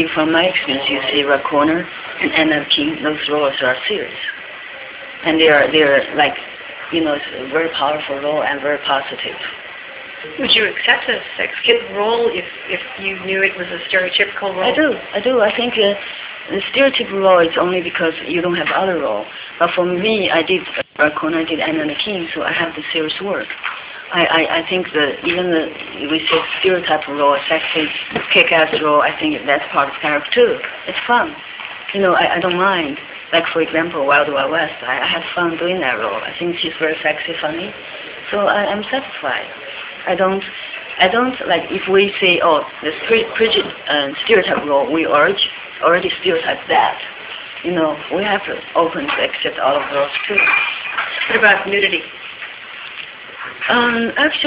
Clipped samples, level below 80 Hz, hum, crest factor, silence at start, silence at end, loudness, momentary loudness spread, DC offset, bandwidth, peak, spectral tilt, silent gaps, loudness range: under 0.1%; -54 dBFS; none; 18 dB; 0 s; 0 s; -16 LUFS; 13 LU; under 0.1%; 4 kHz; 0 dBFS; -7.5 dB/octave; none; 4 LU